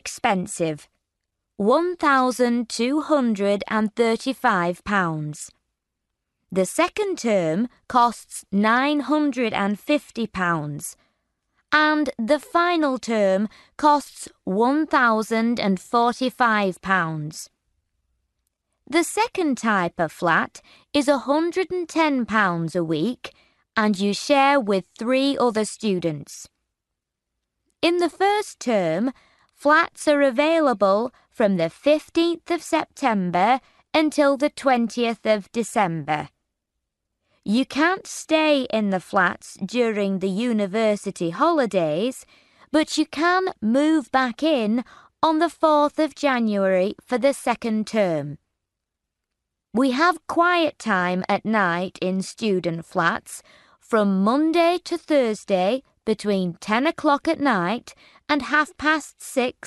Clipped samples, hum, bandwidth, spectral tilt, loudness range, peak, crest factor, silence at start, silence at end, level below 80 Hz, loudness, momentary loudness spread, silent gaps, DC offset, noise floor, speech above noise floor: under 0.1%; none; 12 kHz; -5 dB/octave; 4 LU; -4 dBFS; 18 dB; 0.05 s; 0 s; -62 dBFS; -22 LUFS; 8 LU; none; under 0.1%; -83 dBFS; 62 dB